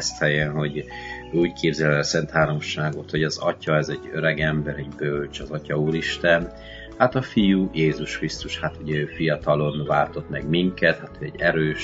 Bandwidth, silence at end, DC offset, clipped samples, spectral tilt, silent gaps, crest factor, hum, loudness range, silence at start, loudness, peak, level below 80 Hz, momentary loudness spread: 7.8 kHz; 0 s; under 0.1%; under 0.1%; -5.5 dB/octave; none; 22 dB; none; 2 LU; 0 s; -23 LUFS; 0 dBFS; -44 dBFS; 9 LU